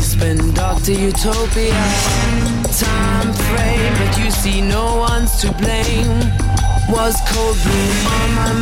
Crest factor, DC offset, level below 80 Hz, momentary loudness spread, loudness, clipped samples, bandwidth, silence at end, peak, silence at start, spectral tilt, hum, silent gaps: 10 dB; 0.6%; -18 dBFS; 2 LU; -16 LUFS; under 0.1%; 16.5 kHz; 0 s; -4 dBFS; 0 s; -4.5 dB/octave; none; none